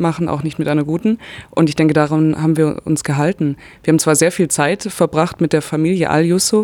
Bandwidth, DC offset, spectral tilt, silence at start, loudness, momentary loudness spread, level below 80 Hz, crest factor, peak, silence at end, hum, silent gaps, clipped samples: 18 kHz; under 0.1%; -5.5 dB/octave; 0 s; -16 LUFS; 7 LU; -50 dBFS; 14 dB; 0 dBFS; 0 s; none; none; under 0.1%